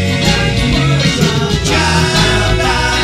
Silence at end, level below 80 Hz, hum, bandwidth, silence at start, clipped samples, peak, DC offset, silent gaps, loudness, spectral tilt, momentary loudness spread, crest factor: 0 s; -22 dBFS; none; 15 kHz; 0 s; under 0.1%; 0 dBFS; under 0.1%; none; -12 LUFS; -4.5 dB/octave; 2 LU; 12 dB